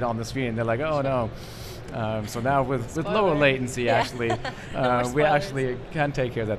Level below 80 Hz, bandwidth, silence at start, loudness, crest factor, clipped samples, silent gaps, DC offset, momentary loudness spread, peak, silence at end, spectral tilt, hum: -44 dBFS; 14 kHz; 0 s; -25 LUFS; 18 dB; under 0.1%; none; under 0.1%; 10 LU; -6 dBFS; 0 s; -6 dB/octave; none